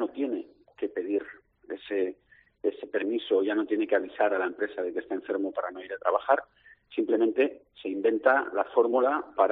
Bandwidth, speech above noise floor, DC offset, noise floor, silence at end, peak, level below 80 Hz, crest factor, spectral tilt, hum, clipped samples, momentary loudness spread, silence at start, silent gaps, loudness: 4.1 kHz; 35 dB; under 0.1%; -62 dBFS; 0 s; -8 dBFS; -74 dBFS; 20 dB; -2 dB/octave; none; under 0.1%; 12 LU; 0 s; none; -28 LUFS